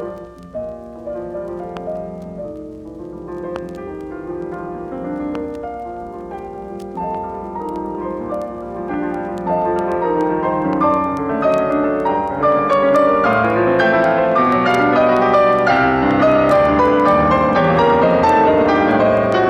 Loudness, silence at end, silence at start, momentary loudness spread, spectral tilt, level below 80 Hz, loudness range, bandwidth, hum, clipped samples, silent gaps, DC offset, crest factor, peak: -16 LUFS; 0 s; 0 s; 17 LU; -7.5 dB/octave; -42 dBFS; 15 LU; 10.5 kHz; none; under 0.1%; none; under 0.1%; 14 dB; -2 dBFS